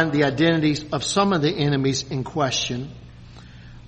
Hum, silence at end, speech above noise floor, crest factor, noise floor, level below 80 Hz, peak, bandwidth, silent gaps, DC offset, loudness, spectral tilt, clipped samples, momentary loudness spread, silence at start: none; 0 s; 21 dB; 18 dB; -42 dBFS; -48 dBFS; -4 dBFS; 8.8 kHz; none; under 0.1%; -22 LUFS; -5 dB/octave; under 0.1%; 9 LU; 0 s